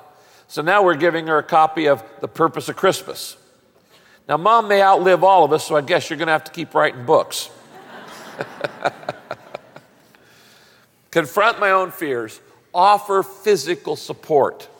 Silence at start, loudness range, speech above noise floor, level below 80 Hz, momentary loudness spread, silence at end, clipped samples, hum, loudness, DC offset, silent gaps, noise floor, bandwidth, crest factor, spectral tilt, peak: 0.5 s; 11 LU; 37 dB; -68 dBFS; 19 LU; 0.15 s; under 0.1%; none; -18 LUFS; under 0.1%; none; -55 dBFS; 17 kHz; 16 dB; -4 dB/octave; -2 dBFS